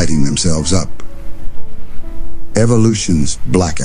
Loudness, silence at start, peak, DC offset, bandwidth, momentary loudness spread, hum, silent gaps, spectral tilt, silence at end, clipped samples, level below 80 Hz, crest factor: -14 LUFS; 0 s; 0 dBFS; under 0.1%; 10.5 kHz; 23 LU; none; none; -5 dB/octave; 0 s; under 0.1%; -26 dBFS; 10 dB